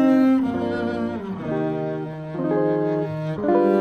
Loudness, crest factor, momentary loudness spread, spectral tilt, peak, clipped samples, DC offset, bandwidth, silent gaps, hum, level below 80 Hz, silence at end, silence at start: -23 LUFS; 14 dB; 10 LU; -9 dB/octave; -6 dBFS; under 0.1%; under 0.1%; 6.4 kHz; none; none; -56 dBFS; 0 s; 0 s